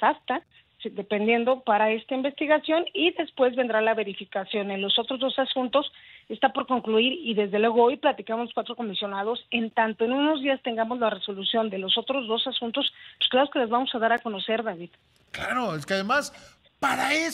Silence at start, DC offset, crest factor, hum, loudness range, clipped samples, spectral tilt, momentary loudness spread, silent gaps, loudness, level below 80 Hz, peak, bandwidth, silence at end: 0 s; under 0.1%; 18 dB; none; 2 LU; under 0.1%; -4 dB/octave; 8 LU; none; -25 LUFS; -68 dBFS; -8 dBFS; 15.5 kHz; 0 s